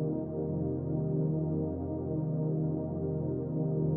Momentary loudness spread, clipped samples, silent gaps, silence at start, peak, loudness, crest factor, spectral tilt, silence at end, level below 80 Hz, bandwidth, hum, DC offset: 3 LU; under 0.1%; none; 0 s; -20 dBFS; -33 LUFS; 12 dB; -16 dB/octave; 0 s; -56 dBFS; 1.7 kHz; none; under 0.1%